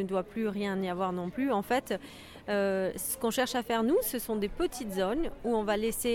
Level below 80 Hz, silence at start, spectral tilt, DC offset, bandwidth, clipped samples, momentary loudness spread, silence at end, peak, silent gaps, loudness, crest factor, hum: -52 dBFS; 0 s; -4.5 dB/octave; under 0.1%; 18 kHz; under 0.1%; 5 LU; 0 s; -16 dBFS; none; -31 LUFS; 16 dB; none